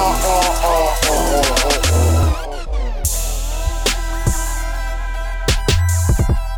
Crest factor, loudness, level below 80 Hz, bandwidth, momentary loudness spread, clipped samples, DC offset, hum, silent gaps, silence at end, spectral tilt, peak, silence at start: 12 dB; -18 LUFS; -20 dBFS; 19.5 kHz; 10 LU; under 0.1%; under 0.1%; none; none; 0 s; -4 dB/octave; -4 dBFS; 0 s